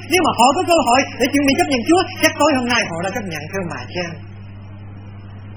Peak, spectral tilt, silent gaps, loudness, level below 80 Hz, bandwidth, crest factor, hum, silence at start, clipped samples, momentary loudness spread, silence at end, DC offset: 0 dBFS; -4 dB/octave; none; -17 LUFS; -44 dBFS; 17.5 kHz; 18 dB; none; 0 s; under 0.1%; 22 LU; 0 s; under 0.1%